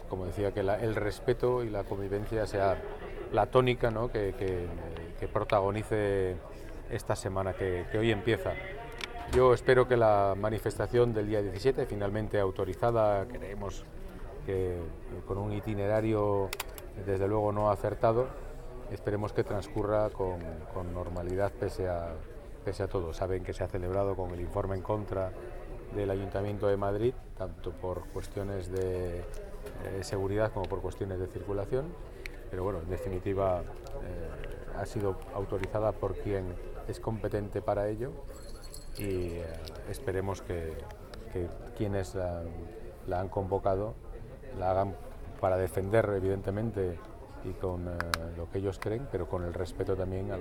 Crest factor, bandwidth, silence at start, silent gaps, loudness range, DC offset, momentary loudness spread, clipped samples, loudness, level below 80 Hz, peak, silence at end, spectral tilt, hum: 24 dB; 17.5 kHz; 0 s; none; 8 LU; under 0.1%; 14 LU; under 0.1%; -33 LUFS; -44 dBFS; -8 dBFS; 0 s; -7 dB/octave; none